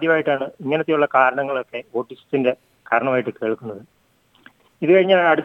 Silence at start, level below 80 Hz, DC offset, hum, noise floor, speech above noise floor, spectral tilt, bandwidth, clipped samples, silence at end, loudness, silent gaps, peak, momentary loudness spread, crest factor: 0 s; -72 dBFS; under 0.1%; none; -59 dBFS; 40 dB; -7.5 dB/octave; 5.8 kHz; under 0.1%; 0 s; -20 LUFS; none; -2 dBFS; 13 LU; 18 dB